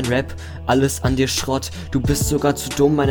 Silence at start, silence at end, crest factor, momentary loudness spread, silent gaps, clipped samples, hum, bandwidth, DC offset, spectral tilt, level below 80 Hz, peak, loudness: 0 s; 0 s; 14 dB; 7 LU; none; under 0.1%; none; 19 kHz; under 0.1%; -5 dB/octave; -32 dBFS; -4 dBFS; -20 LUFS